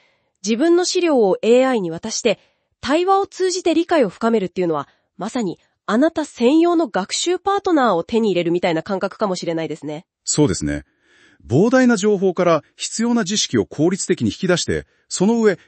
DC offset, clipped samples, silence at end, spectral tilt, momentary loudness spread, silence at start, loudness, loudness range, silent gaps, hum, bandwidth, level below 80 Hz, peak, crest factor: under 0.1%; under 0.1%; 0.1 s; -4.5 dB/octave; 11 LU; 0.45 s; -18 LUFS; 2 LU; none; none; 8.8 kHz; -52 dBFS; -4 dBFS; 14 dB